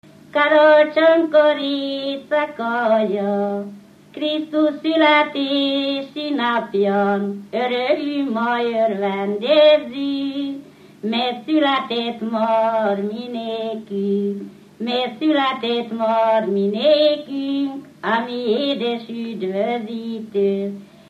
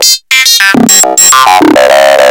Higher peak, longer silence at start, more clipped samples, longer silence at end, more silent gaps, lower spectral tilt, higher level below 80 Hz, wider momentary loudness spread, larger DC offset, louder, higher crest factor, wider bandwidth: about the same, -2 dBFS vs 0 dBFS; first, 0.35 s vs 0 s; second, under 0.1% vs 10%; first, 0.25 s vs 0 s; neither; first, -6.5 dB/octave vs -1 dB/octave; second, -74 dBFS vs -44 dBFS; first, 12 LU vs 2 LU; neither; second, -19 LUFS vs -3 LUFS; first, 16 dB vs 4 dB; second, 7.6 kHz vs over 20 kHz